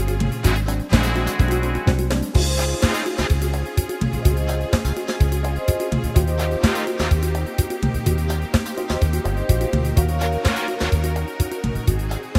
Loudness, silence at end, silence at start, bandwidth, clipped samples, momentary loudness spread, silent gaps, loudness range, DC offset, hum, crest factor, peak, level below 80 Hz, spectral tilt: -21 LUFS; 0 s; 0 s; 16 kHz; under 0.1%; 4 LU; none; 1 LU; under 0.1%; none; 18 dB; 0 dBFS; -24 dBFS; -5.5 dB/octave